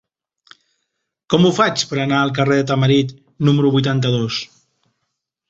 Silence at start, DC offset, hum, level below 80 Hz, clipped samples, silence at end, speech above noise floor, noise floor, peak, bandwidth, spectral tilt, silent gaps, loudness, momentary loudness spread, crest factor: 1.3 s; under 0.1%; none; -54 dBFS; under 0.1%; 1.05 s; 60 dB; -76 dBFS; -2 dBFS; 8 kHz; -6 dB/octave; none; -17 LUFS; 8 LU; 16 dB